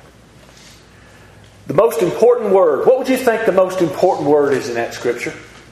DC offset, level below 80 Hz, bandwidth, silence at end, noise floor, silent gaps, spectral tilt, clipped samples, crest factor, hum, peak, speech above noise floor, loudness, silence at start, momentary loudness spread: under 0.1%; -52 dBFS; 14.5 kHz; 0.25 s; -44 dBFS; none; -5.5 dB/octave; under 0.1%; 16 dB; none; 0 dBFS; 29 dB; -15 LUFS; 1.65 s; 8 LU